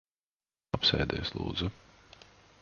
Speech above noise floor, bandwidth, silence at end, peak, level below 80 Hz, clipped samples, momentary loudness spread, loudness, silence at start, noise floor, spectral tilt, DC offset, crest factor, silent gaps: over 58 dB; 7.2 kHz; 0.85 s; -12 dBFS; -48 dBFS; under 0.1%; 11 LU; -31 LUFS; 0.75 s; under -90 dBFS; -5.5 dB/octave; under 0.1%; 24 dB; none